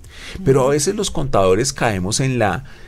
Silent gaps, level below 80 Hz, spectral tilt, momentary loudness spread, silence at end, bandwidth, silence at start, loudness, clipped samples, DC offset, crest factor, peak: none; -34 dBFS; -4.5 dB/octave; 6 LU; 0.05 s; 15.5 kHz; 0.05 s; -18 LUFS; under 0.1%; under 0.1%; 14 dB; -4 dBFS